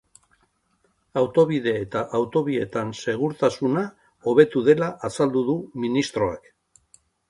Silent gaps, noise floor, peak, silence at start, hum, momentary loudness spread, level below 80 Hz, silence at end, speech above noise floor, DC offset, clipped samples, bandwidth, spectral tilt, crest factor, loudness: none; -68 dBFS; -2 dBFS; 1.15 s; none; 9 LU; -58 dBFS; 0.9 s; 46 dB; under 0.1%; under 0.1%; 11.5 kHz; -6.5 dB/octave; 20 dB; -23 LUFS